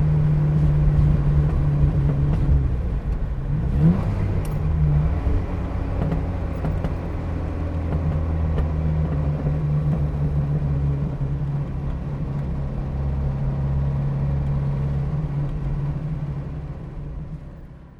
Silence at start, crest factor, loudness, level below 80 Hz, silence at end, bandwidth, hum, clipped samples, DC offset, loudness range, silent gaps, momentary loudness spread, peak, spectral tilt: 0 s; 16 dB; -23 LUFS; -26 dBFS; 0.05 s; 4.9 kHz; none; under 0.1%; under 0.1%; 5 LU; none; 9 LU; -6 dBFS; -10 dB/octave